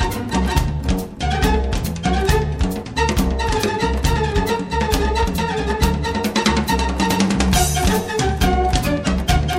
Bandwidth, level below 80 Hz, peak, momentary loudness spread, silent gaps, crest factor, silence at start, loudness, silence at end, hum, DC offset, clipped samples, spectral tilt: 16.5 kHz; -24 dBFS; 0 dBFS; 4 LU; none; 18 dB; 0 s; -19 LUFS; 0 s; none; under 0.1%; under 0.1%; -5 dB/octave